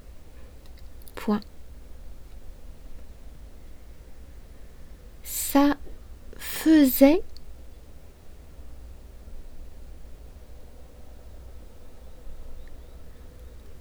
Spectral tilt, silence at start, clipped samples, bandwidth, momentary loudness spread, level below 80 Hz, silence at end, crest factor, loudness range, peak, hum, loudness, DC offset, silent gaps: -4.5 dB/octave; 0.05 s; under 0.1%; over 20 kHz; 29 LU; -44 dBFS; 0 s; 26 dB; 25 LU; -4 dBFS; none; -23 LUFS; under 0.1%; none